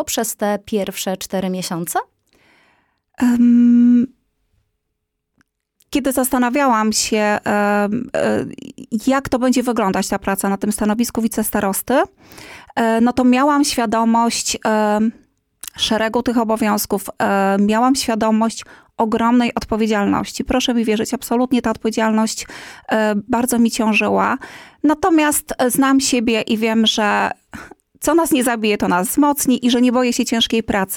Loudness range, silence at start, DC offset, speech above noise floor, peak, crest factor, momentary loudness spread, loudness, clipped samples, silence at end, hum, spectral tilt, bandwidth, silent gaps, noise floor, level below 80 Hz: 3 LU; 0 s; under 0.1%; 58 dB; -6 dBFS; 12 dB; 8 LU; -17 LUFS; under 0.1%; 0 s; none; -4 dB/octave; 18 kHz; none; -75 dBFS; -46 dBFS